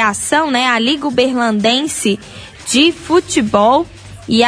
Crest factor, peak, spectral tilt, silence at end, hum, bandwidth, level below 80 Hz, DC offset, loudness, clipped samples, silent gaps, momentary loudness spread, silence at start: 14 dB; 0 dBFS; -3 dB/octave; 0 s; none; 11 kHz; -46 dBFS; under 0.1%; -14 LUFS; under 0.1%; none; 11 LU; 0 s